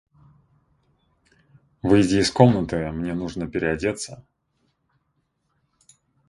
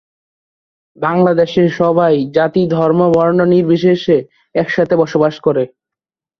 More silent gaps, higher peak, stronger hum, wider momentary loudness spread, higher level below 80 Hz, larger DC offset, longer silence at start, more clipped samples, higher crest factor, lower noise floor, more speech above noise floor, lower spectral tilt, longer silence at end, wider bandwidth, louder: neither; about the same, 0 dBFS vs 0 dBFS; neither; first, 12 LU vs 6 LU; about the same, -48 dBFS vs -52 dBFS; neither; first, 1.85 s vs 1 s; neither; first, 24 dB vs 12 dB; second, -72 dBFS vs -86 dBFS; second, 51 dB vs 74 dB; second, -6 dB/octave vs -8 dB/octave; first, 2.1 s vs 0.75 s; first, 11.5 kHz vs 6.4 kHz; second, -22 LUFS vs -13 LUFS